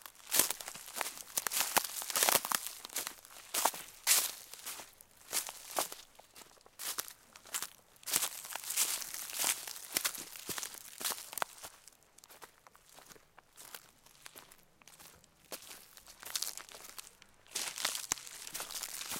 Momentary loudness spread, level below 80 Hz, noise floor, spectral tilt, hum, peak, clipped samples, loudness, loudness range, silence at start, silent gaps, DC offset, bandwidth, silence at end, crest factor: 24 LU; -74 dBFS; -62 dBFS; 1 dB/octave; none; -8 dBFS; under 0.1%; -35 LUFS; 20 LU; 0 s; none; under 0.1%; 17 kHz; 0 s; 30 dB